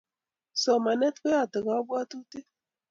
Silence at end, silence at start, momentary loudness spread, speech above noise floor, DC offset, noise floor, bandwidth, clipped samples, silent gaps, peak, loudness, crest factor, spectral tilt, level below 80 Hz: 0.5 s; 0.55 s; 17 LU; 63 dB; under 0.1%; -90 dBFS; 7.6 kHz; under 0.1%; none; -12 dBFS; -27 LUFS; 16 dB; -3.5 dB/octave; -76 dBFS